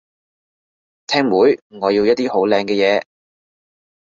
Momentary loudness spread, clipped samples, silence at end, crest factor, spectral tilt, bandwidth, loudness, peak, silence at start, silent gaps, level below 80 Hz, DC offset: 6 LU; under 0.1%; 1.15 s; 18 dB; -5 dB/octave; 7.6 kHz; -16 LUFS; -2 dBFS; 1.1 s; 1.62-1.70 s; -60 dBFS; under 0.1%